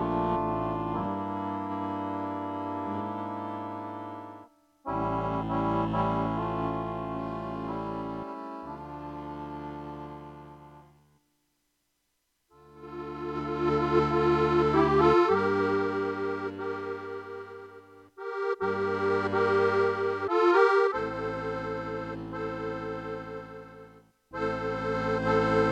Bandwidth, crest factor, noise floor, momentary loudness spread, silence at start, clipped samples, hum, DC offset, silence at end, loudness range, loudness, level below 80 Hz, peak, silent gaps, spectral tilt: 8.4 kHz; 20 dB; -77 dBFS; 17 LU; 0 s; under 0.1%; none; under 0.1%; 0 s; 16 LU; -29 LUFS; -52 dBFS; -10 dBFS; none; -7.5 dB/octave